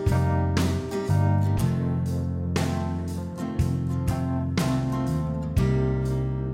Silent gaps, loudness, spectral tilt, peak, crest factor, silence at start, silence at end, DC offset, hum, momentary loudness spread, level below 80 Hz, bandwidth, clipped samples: none; -26 LUFS; -7.5 dB/octave; -10 dBFS; 14 dB; 0 s; 0 s; under 0.1%; none; 5 LU; -36 dBFS; 16 kHz; under 0.1%